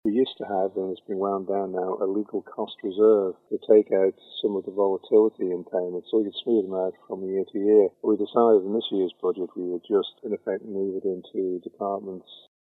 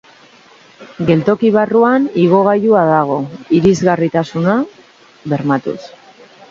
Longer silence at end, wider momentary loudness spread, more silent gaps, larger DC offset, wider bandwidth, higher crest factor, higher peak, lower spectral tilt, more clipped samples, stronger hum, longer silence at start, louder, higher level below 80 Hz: second, 0.25 s vs 0.65 s; about the same, 12 LU vs 10 LU; neither; neither; second, 4.1 kHz vs 7.6 kHz; about the same, 18 dB vs 14 dB; second, -6 dBFS vs 0 dBFS; first, -9 dB/octave vs -7.5 dB/octave; neither; neither; second, 0.05 s vs 0.8 s; second, -25 LUFS vs -13 LUFS; second, -80 dBFS vs -50 dBFS